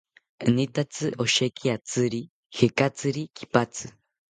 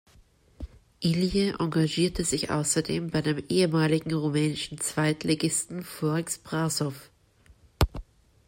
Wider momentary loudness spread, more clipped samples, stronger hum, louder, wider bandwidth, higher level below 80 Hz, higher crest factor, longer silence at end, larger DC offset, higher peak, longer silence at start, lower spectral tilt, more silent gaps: about the same, 11 LU vs 9 LU; neither; neither; about the same, -26 LUFS vs -27 LUFS; second, 9.6 kHz vs 16.5 kHz; second, -62 dBFS vs -44 dBFS; about the same, 24 dB vs 22 dB; about the same, 0.4 s vs 0.45 s; neither; first, -2 dBFS vs -6 dBFS; second, 0.4 s vs 0.6 s; about the same, -4.5 dB/octave vs -4.5 dB/octave; first, 2.30-2.50 s vs none